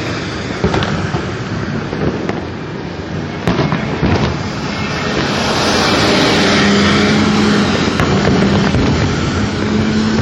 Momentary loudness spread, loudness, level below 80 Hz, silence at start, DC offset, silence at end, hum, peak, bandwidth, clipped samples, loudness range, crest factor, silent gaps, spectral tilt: 10 LU; -14 LUFS; -32 dBFS; 0 s; under 0.1%; 0 s; none; 0 dBFS; 12 kHz; under 0.1%; 7 LU; 14 dB; none; -5 dB/octave